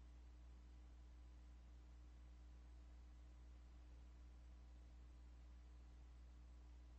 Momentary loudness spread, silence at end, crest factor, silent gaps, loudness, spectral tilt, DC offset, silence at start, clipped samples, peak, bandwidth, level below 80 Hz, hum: 0 LU; 0 s; 8 dB; none; -65 LUFS; -6 dB/octave; under 0.1%; 0 s; under 0.1%; -54 dBFS; 8.2 kHz; -62 dBFS; 60 Hz at -60 dBFS